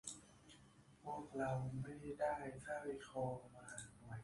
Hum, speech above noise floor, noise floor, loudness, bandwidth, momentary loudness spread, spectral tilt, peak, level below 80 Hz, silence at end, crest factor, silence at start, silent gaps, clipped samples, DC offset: none; 22 dB; -67 dBFS; -47 LUFS; 11.5 kHz; 21 LU; -5.5 dB/octave; -30 dBFS; -70 dBFS; 0 s; 18 dB; 0.05 s; none; under 0.1%; under 0.1%